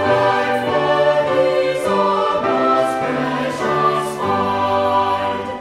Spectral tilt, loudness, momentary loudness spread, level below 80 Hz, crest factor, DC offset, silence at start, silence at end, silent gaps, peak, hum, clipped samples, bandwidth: -5.5 dB/octave; -17 LUFS; 4 LU; -52 dBFS; 14 dB; under 0.1%; 0 s; 0 s; none; -4 dBFS; none; under 0.1%; 15 kHz